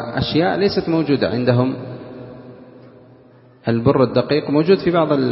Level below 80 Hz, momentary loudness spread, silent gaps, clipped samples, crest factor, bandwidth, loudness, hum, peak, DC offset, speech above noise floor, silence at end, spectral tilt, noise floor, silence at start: -48 dBFS; 19 LU; none; under 0.1%; 18 dB; 5.8 kHz; -17 LUFS; none; 0 dBFS; under 0.1%; 31 dB; 0 s; -10.5 dB/octave; -47 dBFS; 0 s